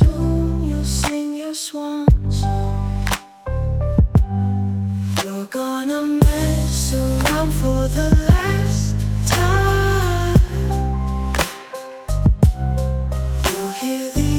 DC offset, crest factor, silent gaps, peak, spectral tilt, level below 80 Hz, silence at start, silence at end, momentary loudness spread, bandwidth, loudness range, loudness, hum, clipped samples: under 0.1%; 18 dB; none; 0 dBFS; -5.5 dB/octave; -22 dBFS; 0 s; 0 s; 8 LU; 19 kHz; 3 LU; -19 LUFS; none; under 0.1%